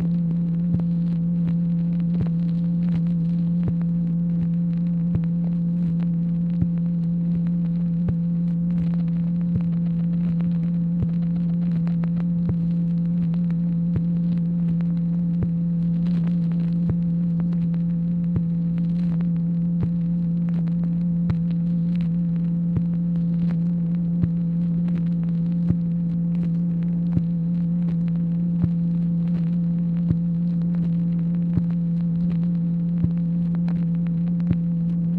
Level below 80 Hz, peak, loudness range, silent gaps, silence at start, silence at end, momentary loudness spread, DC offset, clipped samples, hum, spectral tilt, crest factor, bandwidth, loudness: -44 dBFS; -8 dBFS; 0 LU; none; 0 s; 0 s; 1 LU; under 0.1%; under 0.1%; none; -12 dB/octave; 14 dB; 2.6 kHz; -23 LUFS